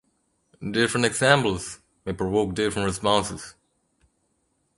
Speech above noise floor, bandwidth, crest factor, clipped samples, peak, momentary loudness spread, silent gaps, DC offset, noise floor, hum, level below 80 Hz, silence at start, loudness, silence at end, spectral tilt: 48 dB; 11.5 kHz; 22 dB; under 0.1%; -4 dBFS; 18 LU; none; under 0.1%; -71 dBFS; none; -50 dBFS; 0.6 s; -23 LUFS; 1.25 s; -4 dB/octave